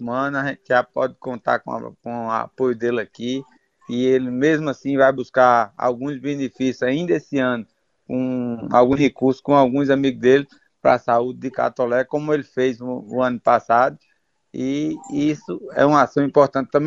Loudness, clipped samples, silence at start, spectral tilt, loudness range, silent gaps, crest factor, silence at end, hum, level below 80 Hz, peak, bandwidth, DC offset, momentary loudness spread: -20 LUFS; under 0.1%; 0 s; -6.5 dB/octave; 5 LU; none; 18 dB; 0 s; none; -58 dBFS; -2 dBFS; 7.8 kHz; under 0.1%; 11 LU